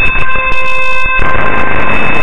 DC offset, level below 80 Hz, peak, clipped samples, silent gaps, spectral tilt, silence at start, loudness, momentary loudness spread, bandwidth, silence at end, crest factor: under 0.1%; -20 dBFS; 0 dBFS; 1%; none; -5.5 dB/octave; 0 s; -11 LUFS; 1 LU; 9.4 kHz; 0 s; 6 dB